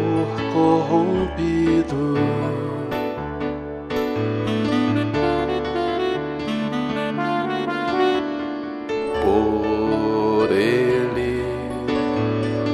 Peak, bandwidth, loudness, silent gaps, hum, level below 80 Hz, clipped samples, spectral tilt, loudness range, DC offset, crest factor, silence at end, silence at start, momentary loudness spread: -6 dBFS; 14 kHz; -21 LUFS; none; none; -42 dBFS; under 0.1%; -7 dB/octave; 3 LU; under 0.1%; 16 dB; 0 s; 0 s; 8 LU